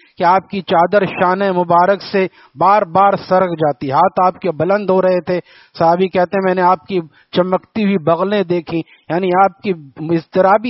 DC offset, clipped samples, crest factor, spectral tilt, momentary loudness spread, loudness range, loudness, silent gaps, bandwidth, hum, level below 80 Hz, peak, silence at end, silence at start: under 0.1%; under 0.1%; 14 dB; -5 dB/octave; 9 LU; 3 LU; -15 LUFS; none; 6 kHz; none; -58 dBFS; 0 dBFS; 0 s; 0.2 s